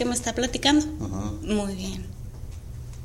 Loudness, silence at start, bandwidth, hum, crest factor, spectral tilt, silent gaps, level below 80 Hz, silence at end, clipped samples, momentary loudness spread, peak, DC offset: -26 LUFS; 0 s; 16 kHz; none; 22 dB; -4 dB/octave; none; -38 dBFS; 0 s; under 0.1%; 19 LU; -6 dBFS; under 0.1%